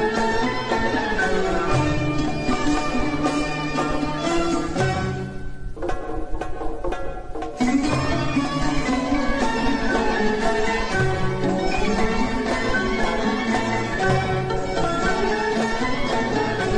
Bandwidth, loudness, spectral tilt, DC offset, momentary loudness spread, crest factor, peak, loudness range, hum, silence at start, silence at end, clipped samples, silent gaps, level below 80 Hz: 10.5 kHz; -23 LUFS; -5.5 dB/octave; under 0.1%; 9 LU; 14 dB; -6 dBFS; 4 LU; none; 0 s; 0 s; under 0.1%; none; -32 dBFS